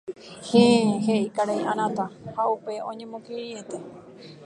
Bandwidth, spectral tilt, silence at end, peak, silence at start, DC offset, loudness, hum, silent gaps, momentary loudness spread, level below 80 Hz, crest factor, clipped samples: 11 kHz; -5.5 dB/octave; 0 s; -4 dBFS; 0.05 s; under 0.1%; -24 LUFS; none; none; 20 LU; -68 dBFS; 20 dB; under 0.1%